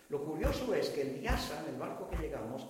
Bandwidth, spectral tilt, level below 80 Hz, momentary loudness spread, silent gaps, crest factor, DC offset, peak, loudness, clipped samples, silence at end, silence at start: 16 kHz; -5.5 dB/octave; -44 dBFS; 6 LU; none; 18 dB; under 0.1%; -18 dBFS; -37 LUFS; under 0.1%; 0 s; 0 s